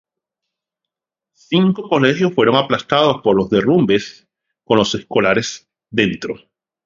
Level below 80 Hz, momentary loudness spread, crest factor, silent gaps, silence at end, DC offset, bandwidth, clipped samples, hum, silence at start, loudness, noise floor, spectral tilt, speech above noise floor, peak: -52 dBFS; 12 LU; 18 dB; none; 0.5 s; under 0.1%; 7.6 kHz; under 0.1%; none; 1.5 s; -16 LUFS; -85 dBFS; -5.5 dB/octave; 69 dB; 0 dBFS